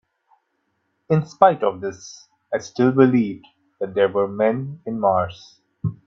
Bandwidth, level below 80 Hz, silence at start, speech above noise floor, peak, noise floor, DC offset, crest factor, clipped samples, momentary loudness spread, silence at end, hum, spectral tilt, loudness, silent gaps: 7.4 kHz; -60 dBFS; 1.1 s; 52 dB; 0 dBFS; -71 dBFS; under 0.1%; 20 dB; under 0.1%; 15 LU; 0.15 s; none; -7.5 dB/octave; -20 LUFS; none